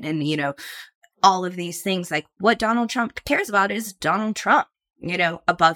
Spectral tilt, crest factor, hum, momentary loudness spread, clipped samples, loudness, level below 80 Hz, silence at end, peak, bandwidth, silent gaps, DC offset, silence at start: -4 dB/octave; 22 dB; none; 9 LU; under 0.1%; -22 LUFS; -56 dBFS; 0 s; 0 dBFS; 18 kHz; 0.95-1.01 s; under 0.1%; 0 s